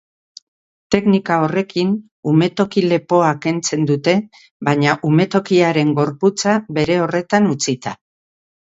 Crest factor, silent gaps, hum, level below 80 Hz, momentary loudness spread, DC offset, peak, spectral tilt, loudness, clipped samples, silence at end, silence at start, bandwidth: 16 dB; 2.11-2.23 s, 4.51-4.60 s; none; -54 dBFS; 5 LU; under 0.1%; 0 dBFS; -5.5 dB/octave; -17 LUFS; under 0.1%; 0.8 s; 0.9 s; 8 kHz